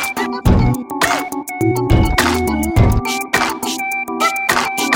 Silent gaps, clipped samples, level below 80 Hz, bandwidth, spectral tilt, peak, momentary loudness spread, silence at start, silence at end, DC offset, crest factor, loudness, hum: none; under 0.1%; -24 dBFS; 17 kHz; -4.5 dB/octave; 0 dBFS; 5 LU; 0 s; 0 s; under 0.1%; 16 dB; -16 LUFS; none